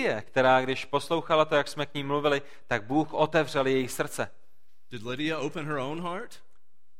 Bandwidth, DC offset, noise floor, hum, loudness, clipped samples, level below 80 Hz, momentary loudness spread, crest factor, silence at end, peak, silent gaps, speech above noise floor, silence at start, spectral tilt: 16.5 kHz; 1%; -73 dBFS; none; -28 LUFS; under 0.1%; -62 dBFS; 12 LU; 20 dB; 0.65 s; -8 dBFS; none; 45 dB; 0 s; -5 dB/octave